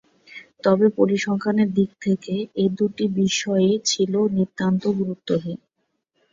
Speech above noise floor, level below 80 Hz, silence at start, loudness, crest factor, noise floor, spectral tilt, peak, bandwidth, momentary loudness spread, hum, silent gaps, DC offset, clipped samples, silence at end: 53 dB; -62 dBFS; 0.3 s; -21 LUFS; 18 dB; -74 dBFS; -5.5 dB/octave; -4 dBFS; 7.8 kHz; 8 LU; none; none; under 0.1%; under 0.1%; 0.75 s